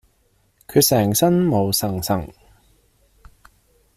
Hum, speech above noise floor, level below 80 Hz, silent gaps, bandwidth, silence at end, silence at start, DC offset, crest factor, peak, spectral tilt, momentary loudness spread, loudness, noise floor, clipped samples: none; 44 dB; -50 dBFS; none; 16 kHz; 1.65 s; 0.7 s; under 0.1%; 18 dB; -4 dBFS; -5 dB/octave; 9 LU; -18 LUFS; -62 dBFS; under 0.1%